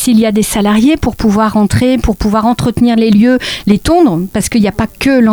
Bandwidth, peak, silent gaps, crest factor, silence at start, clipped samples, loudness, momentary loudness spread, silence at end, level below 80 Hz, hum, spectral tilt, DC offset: over 20 kHz; 0 dBFS; none; 10 dB; 0 s; under 0.1%; -10 LUFS; 4 LU; 0 s; -26 dBFS; none; -5.5 dB/octave; under 0.1%